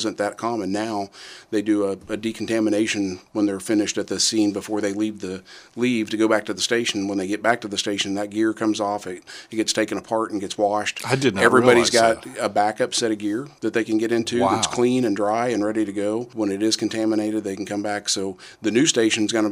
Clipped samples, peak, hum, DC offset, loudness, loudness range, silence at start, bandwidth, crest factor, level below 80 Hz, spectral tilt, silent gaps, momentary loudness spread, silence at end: under 0.1%; -2 dBFS; none; under 0.1%; -22 LUFS; 4 LU; 0 s; 15 kHz; 20 dB; -62 dBFS; -3.5 dB/octave; none; 9 LU; 0 s